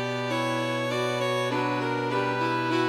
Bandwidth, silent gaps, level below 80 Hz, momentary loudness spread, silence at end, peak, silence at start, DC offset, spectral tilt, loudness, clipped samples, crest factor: 16 kHz; none; -68 dBFS; 1 LU; 0 s; -14 dBFS; 0 s; under 0.1%; -5.5 dB/octave; -27 LUFS; under 0.1%; 12 dB